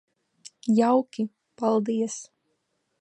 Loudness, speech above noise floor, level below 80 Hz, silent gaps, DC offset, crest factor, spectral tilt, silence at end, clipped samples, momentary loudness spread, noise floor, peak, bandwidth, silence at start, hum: -25 LUFS; 51 dB; -80 dBFS; none; under 0.1%; 18 dB; -6 dB/octave; 0.75 s; under 0.1%; 13 LU; -75 dBFS; -10 dBFS; 9.6 kHz; 0.65 s; none